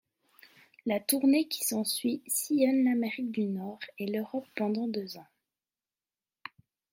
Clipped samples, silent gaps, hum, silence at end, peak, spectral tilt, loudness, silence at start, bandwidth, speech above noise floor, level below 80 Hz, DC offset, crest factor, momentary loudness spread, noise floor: under 0.1%; none; none; 1.7 s; -12 dBFS; -4 dB/octave; -30 LUFS; 0.85 s; 16.5 kHz; over 60 dB; -80 dBFS; under 0.1%; 20 dB; 18 LU; under -90 dBFS